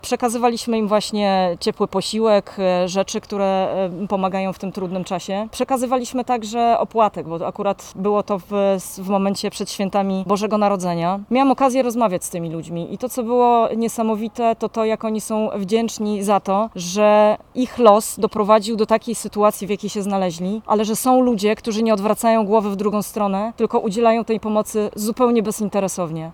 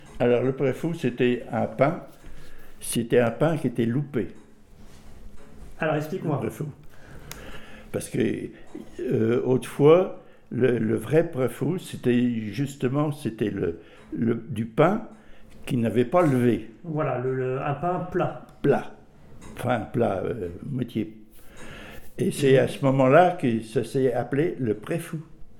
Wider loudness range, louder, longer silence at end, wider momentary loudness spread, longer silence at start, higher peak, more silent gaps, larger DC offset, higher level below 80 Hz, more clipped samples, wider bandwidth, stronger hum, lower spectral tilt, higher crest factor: second, 4 LU vs 8 LU; first, -19 LUFS vs -25 LUFS; about the same, 0 s vs 0 s; second, 8 LU vs 17 LU; about the same, 0.05 s vs 0 s; first, 0 dBFS vs -4 dBFS; neither; neither; about the same, -54 dBFS vs -50 dBFS; neither; about the same, 18 kHz vs 17.5 kHz; neither; second, -5 dB/octave vs -7 dB/octave; about the same, 18 dB vs 20 dB